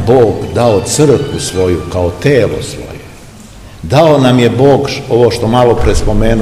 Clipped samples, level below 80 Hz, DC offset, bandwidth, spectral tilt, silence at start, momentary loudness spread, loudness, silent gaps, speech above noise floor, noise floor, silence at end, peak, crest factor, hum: 2%; -22 dBFS; 0.5%; 15.5 kHz; -6 dB/octave; 0 s; 10 LU; -10 LUFS; none; 23 dB; -33 dBFS; 0 s; 0 dBFS; 10 dB; none